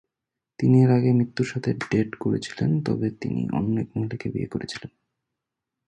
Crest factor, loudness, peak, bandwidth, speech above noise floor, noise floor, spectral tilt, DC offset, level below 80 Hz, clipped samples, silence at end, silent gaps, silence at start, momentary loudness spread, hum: 18 dB; -24 LUFS; -6 dBFS; 9.2 kHz; 63 dB; -86 dBFS; -8 dB/octave; under 0.1%; -54 dBFS; under 0.1%; 1 s; none; 0.6 s; 12 LU; none